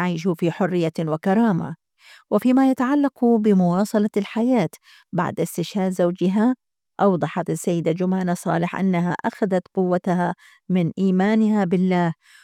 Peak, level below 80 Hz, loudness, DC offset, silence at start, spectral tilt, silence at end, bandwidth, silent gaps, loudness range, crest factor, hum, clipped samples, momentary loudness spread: -6 dBFS; -68 dBFS; -21 LUFS; under 0.1%; 0 s; -7.5 dB/octave; 0.3 s; 15 kHz; none; 3 LU; 14 dB; none; under 0.1%; 7 LU